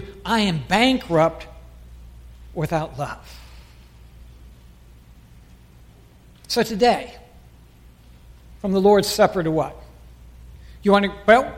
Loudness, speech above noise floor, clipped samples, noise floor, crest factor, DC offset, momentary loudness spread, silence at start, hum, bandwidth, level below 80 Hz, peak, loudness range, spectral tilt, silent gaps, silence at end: -20 LUFS; 30 dB; under 0.1%; -49 dBFS; 20 dB; under 0.1%; 20 LU; 0 s; none; 16.5 kHz; -44 dBFS; -2 dBFS; 11 LU; -5 dB/octave; none; 0 s